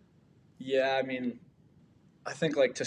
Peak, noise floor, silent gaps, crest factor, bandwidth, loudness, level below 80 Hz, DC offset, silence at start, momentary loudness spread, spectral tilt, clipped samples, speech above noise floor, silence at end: -14 dBFS; -62 dBFS; none; 20 dB; 10 kHz; -31 LUFS; -74 dBFS; under 0.1%; 0.6 s; 17 LU; -4.5 dB/octave; under 0.1%; 33 dB; 0 s